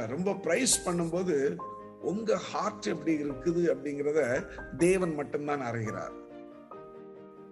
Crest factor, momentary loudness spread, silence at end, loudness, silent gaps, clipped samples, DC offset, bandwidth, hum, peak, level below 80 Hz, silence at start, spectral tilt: 18 dB; 21 LU; 0 s; -30 LUFS; none; under 0.1%; under 0.1%; 12.5 kHz; none; -12 dBFS; -58 dBFS; 0 s; -4.5 dB/octave